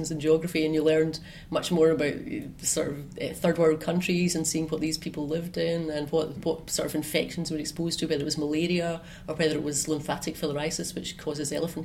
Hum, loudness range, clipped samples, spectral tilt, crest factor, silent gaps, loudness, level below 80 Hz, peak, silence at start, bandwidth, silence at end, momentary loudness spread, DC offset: none; 3 LU; under 0.1%; -4.5 dB/octave; 16 dB; none; -28 LUFS; -52 dBFS; -10 dBFS; 0 s; 16.5 kHz; 0 s; 9 LU; under 0.1%